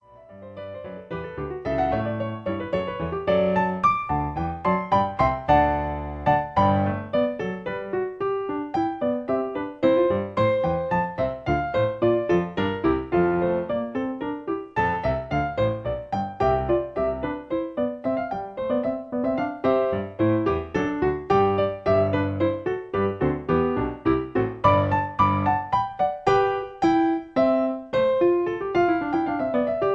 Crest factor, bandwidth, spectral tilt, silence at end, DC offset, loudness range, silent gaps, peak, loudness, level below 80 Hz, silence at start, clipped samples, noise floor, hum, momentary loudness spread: 18 dB; 7.8 kHz; -8.5 dB/octave; 0 s; under 0.1%; 4 LU; none; -4 dBFS; -24 LUFS; -44 dBFS; 0.1 s; under 0.1%; -45 dBFS; none; 8 LU